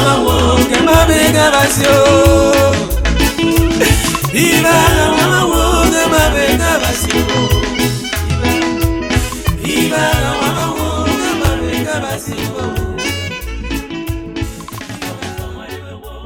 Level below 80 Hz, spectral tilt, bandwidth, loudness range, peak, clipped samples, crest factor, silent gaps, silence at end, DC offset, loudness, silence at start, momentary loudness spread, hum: -24 dBFS; -4.5 dB/octave; 18 kHz; 10 LU; 0 dBFS; under 0.1%; 12 dB; none; 0 s; under 0.1%; -13 LUFS; 0 s; 14 LU; none